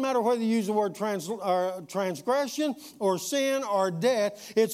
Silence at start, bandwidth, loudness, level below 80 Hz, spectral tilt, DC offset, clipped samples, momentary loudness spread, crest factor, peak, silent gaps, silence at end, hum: 0 s; 16 kHz; -28 LUFS; -78 dBFS; -4.5 dB/octave; under 0.1%; under 0.1%; 6 LU; 16 dB; -12 dBFS; none; 0 s; none